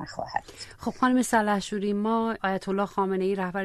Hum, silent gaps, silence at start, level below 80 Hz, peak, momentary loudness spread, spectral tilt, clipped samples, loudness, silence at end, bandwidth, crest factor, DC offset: none; none; 0 s; -56 dBFS; -10 dBFS; 10 LU; -5 dB/octave; under 0.1%; -27 LUFS; 0 s; 13.5 kHz; 16 dB; under 0.1%